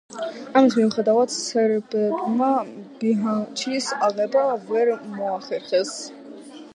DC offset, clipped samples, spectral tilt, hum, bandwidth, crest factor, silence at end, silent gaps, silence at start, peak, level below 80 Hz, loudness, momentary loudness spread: under 0.1%; under 0.1%; -4.5 dB/octave; none; 11 kHz; 20 dB; 0.05 s; none; 0.1 s; -2 dBFS; -76 dBFS; -22 LUFS; 14 LU